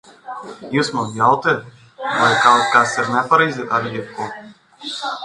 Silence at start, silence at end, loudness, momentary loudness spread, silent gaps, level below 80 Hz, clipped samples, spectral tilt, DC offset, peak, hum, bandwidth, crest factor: 0.25 s; 0 s; -17 LUFS; 19 LU; none; -62 dBFS; under 0.1%; -4 dB/octave; under 0.1%; 0 dBFS; none; 11.5 kHz; 18 dB